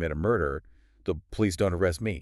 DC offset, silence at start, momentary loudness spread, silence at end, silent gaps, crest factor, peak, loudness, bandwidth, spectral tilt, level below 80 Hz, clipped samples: under 0.1%; 0 s; 9 LU; 0 s; none; 16 dB; -12 dBFS; -28 LUFS; 13.5 kHz; -6.5 dB/octave; -42 dBFS; under 0.1%